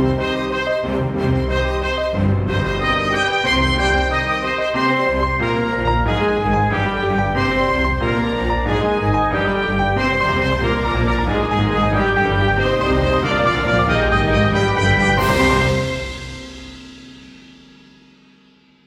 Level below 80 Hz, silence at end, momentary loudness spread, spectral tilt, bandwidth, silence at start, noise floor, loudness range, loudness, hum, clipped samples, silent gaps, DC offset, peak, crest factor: -28 dBFS; 1.35 s; 5 LU; -6 dB/octave; 16 kHz; 0 s; -52 dBFS; 3 LU; -18 LUFS; none; under 0.1%; none; under 0.1%; -2 dBFS; 16 dB